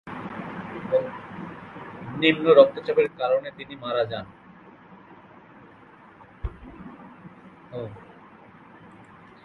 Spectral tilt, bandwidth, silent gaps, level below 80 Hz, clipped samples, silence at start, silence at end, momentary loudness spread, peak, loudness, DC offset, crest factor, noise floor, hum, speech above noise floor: -7.5 dB/octave; 4.5 kHz; none; -50 dBFS; under 0.1%; 0.05 s; 0.6 s; 27 LU; -2 dBFS; -23 LUFS; under 0.1%; 26 dB; -50 dBFS; none; 28 dB